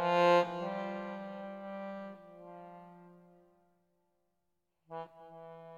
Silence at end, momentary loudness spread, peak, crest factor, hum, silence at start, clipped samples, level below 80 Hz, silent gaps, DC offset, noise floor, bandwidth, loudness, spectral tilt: 0 s; 25 LU; -16 dBFS; 22 dB; none; 0 s; under 0.1%; -84 dBFS; none; under 0.1%; -84 dBFS; 10 kHz; -34 LUFS; -6 dB/octave